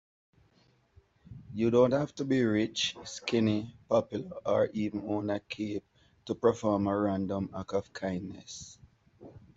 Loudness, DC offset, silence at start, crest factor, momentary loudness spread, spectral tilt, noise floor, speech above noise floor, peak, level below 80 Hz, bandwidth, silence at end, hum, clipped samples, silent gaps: -31 LUFS; under 0.1%; 1.3 s; 20 dB; 15 LU; -5.5 dB/octave; -67 dBFS; 37 dB; -10 dBFS; -64 dBFS; 8 kHz; 0.2 s; none; under 0.1%; none